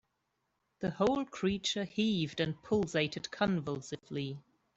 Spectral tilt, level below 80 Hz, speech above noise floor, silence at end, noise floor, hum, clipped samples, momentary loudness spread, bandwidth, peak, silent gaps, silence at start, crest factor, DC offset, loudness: -5 dB/octave; -64 dBFS; 48 dB; 0.35 s; -82 dBFS; none; under 0.1%; 9 LU; 8.2 kHz; -16 dBFS; none; 0.8 s; 18 dB; under 0.1%; -34 LUFS